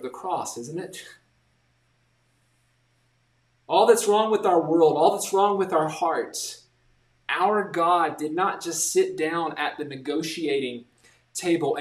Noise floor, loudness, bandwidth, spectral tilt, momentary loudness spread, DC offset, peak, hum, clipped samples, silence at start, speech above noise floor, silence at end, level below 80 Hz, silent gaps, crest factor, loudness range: -67 dBFS; -24 LUFS; 15 kHz; -3.5 dB/octave; 15 LU; under 0.1%; -6 dBFS; none; under 0.1%; 0 s; 44 dB; 0 s; -74 dBFS; none; 20 dB; 9 LU